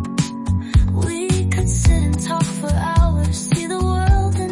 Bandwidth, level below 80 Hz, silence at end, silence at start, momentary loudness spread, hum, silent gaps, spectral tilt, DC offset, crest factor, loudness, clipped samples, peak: 11.5 kHz; -22 dBFS; 0 s; 0 s; 4 LU; none; none; -6 dB/octave; under 0.1%; 12 dB; -19 LUFS; under 0.1%; -4 dBFS